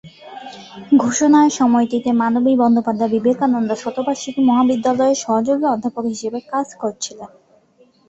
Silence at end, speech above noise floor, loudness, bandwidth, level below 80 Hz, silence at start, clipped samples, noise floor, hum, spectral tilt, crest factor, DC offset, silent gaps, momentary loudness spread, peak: 0.85 s; 38 dB; -17 LUFS; 8 kHz; -60 dBFS; 0.05 s; under 0.1%; -54 dBFS; none; -4.5 dB/octave; 14 dB; under 0.1%; none; 15 LU; -2 dBFS